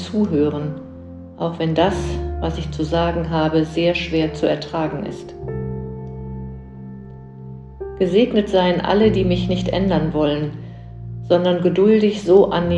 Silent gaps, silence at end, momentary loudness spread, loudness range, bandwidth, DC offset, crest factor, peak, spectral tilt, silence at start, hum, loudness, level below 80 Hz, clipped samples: none; 0 s; 21 LU; 8 LU; 9 kHz; under 0.1%; 18 dB; -2 dBFS; -7.5 dB/octave; 0 s; none; -19 LUFS; -36 dBFS; under 0.1%